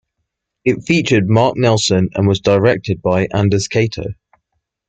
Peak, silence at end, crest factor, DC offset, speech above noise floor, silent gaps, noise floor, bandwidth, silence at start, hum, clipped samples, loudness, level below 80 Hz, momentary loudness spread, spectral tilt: -2 dBFS; 0.75 s; 14 dB; under 0.1%; 60 dB; none; -74 dBFS; 9 kHz; 0.65 s; none; under 0.1%; -15 LUFS; -46 dBFS; 6 LU; -5.5 dB/octave